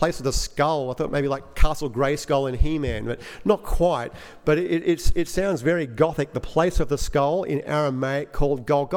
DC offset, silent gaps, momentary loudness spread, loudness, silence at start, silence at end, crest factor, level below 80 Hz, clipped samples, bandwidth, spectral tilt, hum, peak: under 0.1%; none; 5 LU; -24 LUFS; 0 s; 0 s; 18 dB; -30 dBFS; under 0.1%; 16 kHz; -5.5 dB/octave; none; -4 dBFS